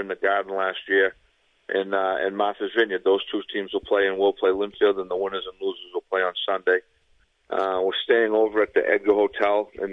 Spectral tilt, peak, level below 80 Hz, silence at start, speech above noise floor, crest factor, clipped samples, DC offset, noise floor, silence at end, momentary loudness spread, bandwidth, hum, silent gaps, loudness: -5.5 dB/octave; -6 dBFS; -62 dBFS; 0 s; 40 dB; 18 dB; under 0.1%; under 0.1%; -63 dBFS; 0 s; 8 LU; 5.8 kHz; none; none; -23 LUFS